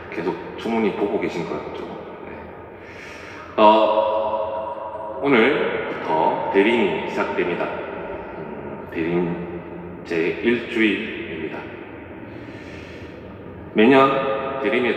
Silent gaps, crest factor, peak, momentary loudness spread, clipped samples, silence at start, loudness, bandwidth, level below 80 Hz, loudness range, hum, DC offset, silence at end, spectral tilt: none; 22 dB; 0 dBFS; 20 LU; under 0.1%; 0 s; -21 LUFS; 9 kHz; -56 dBFS; 7 LU; none; under 0.1%; 0 s; -6.5 dB/octave